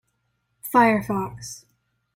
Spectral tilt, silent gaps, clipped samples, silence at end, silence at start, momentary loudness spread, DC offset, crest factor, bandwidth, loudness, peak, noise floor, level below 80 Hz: -5.5 dB/octave; none; under 0.1%; 0.6 s; 0.65 s; 20 LU; under 0.1%; 20 dB; 16.5 kHz; -21 LUFS; -4 dBFS; -73 dBFS; -56 dBFS